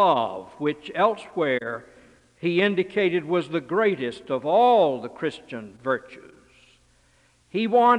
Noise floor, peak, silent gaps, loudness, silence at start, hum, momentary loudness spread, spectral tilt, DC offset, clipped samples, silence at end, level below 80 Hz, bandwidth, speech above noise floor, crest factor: -61 dBFS; -6 dBFS; none; -24 LUFS; 0 s; none; 12 LU; -6.5 dB/octave; under 0.1%; under 0.1%; 0 s; -66 dBFS; 10.5 kHz; 38 dB; 18 dB